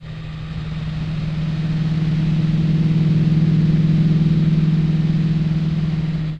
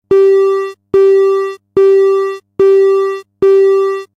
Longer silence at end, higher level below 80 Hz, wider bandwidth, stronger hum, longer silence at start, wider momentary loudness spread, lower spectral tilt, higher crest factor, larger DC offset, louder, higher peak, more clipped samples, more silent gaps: second, 0 s vs 0.15 s; first, -34 dBFS vs -52 dBFS; second, 5.8 kHz vs 7 kHz; neither; about the same, 0 s vs 0.1 s; about the same, 10 LU vs 8 LU; first, -9 dB/octave vs -6 dB/octave; about the same, 12 dB vs 8 dB; neither; second, -18 LUFS vs -11 LUFS; second, -6 dBFS vs -2 dBFS; neither; neither